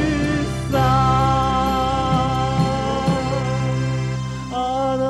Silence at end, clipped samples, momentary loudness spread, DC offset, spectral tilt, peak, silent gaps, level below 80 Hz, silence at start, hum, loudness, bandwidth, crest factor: 0 s; under 0.1%; 7 LU; under 0.1%; -6.5 dB/octave; -6 dBFS; none; -32 dBFS; 0 s; none; -20 LUFS; 12.5 kHz; 12 dB